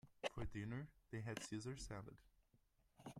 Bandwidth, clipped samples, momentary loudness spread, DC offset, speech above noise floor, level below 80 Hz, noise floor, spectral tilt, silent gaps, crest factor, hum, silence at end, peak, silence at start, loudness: 15.5 kHz; under 0.1%; 12 LU; under 0.1%; 28 dB; -64 dBFS; -79 dBFS; -5 dB/octave; none; 22 dB; none; 0 s; -30 dBFS; 0.05 s; -51 LUFS